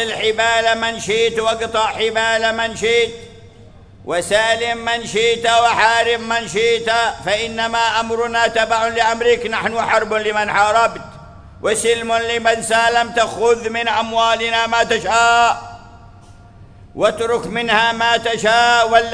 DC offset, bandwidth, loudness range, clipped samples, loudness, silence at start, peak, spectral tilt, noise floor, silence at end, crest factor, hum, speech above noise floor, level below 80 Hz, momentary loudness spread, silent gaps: under 0.1%; 11 kHz; 2 LU; under 0.1%; -16 LUFS; 0 s; 0 dBFS; -2 dB/octave; -42 dBFS; 0 s; 16 dB; none; 26 dB; -46 dBFS; 6 LU; none